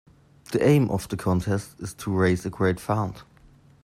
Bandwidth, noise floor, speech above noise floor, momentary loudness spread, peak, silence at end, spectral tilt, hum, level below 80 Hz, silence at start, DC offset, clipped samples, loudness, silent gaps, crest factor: 15 kHz; -54 dBFS; 30 dB; 13 LU; -8 dBFS; 0.6 s; -7 dB/octave; none; -52 dBFS; 0.5 s; under 0.1%; under 0.1%; -25 LUFS; none; 18 dB